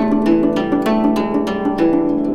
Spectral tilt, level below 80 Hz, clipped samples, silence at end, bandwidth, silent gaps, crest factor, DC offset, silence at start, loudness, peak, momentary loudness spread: -7.5 dB/octave; -42 dBFS; under 0.1%; 0 s; 13 kHz; none; 12 dB; under 0.1%; 0 s; -16 LUFS; -2 dBFS; 4 LU